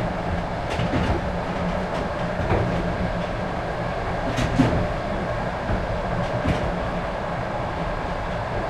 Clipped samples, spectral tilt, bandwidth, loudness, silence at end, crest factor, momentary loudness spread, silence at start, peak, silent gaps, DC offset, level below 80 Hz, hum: under 0.1%; -7 dB/octave; 12 kHz; -25 LUFS; 0 s; 18 dB; 5 LU; 0 s; -6 dBFS; none; under 0.1%; -34 dBFS; none